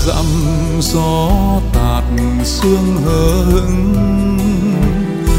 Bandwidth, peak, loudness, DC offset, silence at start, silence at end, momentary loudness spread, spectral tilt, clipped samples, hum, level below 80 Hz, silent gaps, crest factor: 16.5 kHz; 0 dBFS; -14 LUFS; under 0.1%; 0 s; 0 s; 3 LU; -6 dB/octave; under 0.1%; none; -18 dBFS; none; 12 dB